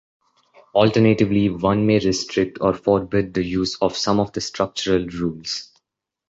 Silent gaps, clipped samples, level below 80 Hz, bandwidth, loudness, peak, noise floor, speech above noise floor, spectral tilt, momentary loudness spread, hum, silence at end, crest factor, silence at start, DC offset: none; under 0.1%; -46 dBFS; 8 kHz; -20 LUFS; -2 dBFS; -80 dBFS; 60 dB; -5.5 dB/octave; 9 LU; none; 0.65 s; 18 dB; 0.75 s; under 0.1%